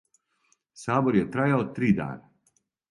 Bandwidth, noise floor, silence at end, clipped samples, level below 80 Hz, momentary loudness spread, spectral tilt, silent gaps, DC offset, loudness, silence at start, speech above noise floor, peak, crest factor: 11.5 kHz; -71 dBFS; 0.7 s; under 0.1%; -58 dBFS; 14 LU; -8 dB/octave; none; under 0.1%; -25 LUFS; 0.75 s; 46 dB; -8 dBFS; 20 dB